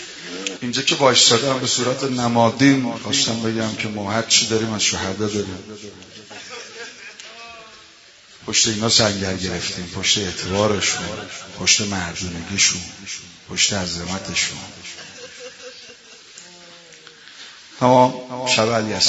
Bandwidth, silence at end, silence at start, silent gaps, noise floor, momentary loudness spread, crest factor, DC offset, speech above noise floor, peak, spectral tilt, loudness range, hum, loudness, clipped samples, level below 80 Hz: 8.2 kHz; 0 s; 0 s; none; -47 dBFS; 22 LU; 20 dB; under 0.1%; 27 dB; 0 dBFS; -2.5 dB/octave; 12 LU; none; -18 LUFS; under 0.1%; -54 dBFS